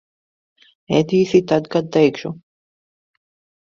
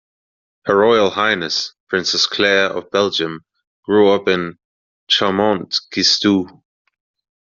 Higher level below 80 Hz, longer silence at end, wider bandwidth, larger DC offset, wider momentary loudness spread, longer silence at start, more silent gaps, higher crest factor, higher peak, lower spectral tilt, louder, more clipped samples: about the same, -58 dBFS vs -60 dBFS; first, 1.25 s vs 1.1 s; about the same, 7.4 kHz vs 7.4 kHz; neither; first, 15 LU vs 9 LU; first, 0.9 s vs 0.65 s; second, none vs 1.80-1.87 s, 3.67-3.83 s, 4.65-5.07 s; about the same, 18 dB vs 18 dB; about the same, -2 dBFS vs 0 dBFS; first, -6.5 dB/octave vs -1.5 dB/octave; about the same, -17 LUFS vs -16 LUFS; neither